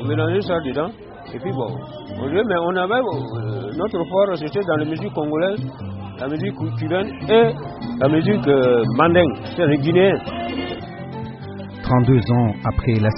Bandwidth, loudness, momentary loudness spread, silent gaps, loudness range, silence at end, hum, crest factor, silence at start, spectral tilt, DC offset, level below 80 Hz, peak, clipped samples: 5.8 kHz; -20 LUFS; 15 LU; none; 5 LU; 0 s; none; 18 dB; 0 s; -6 dB/octave; under 0.1%; -42 dBFS; -2 dBFS; under 0.1%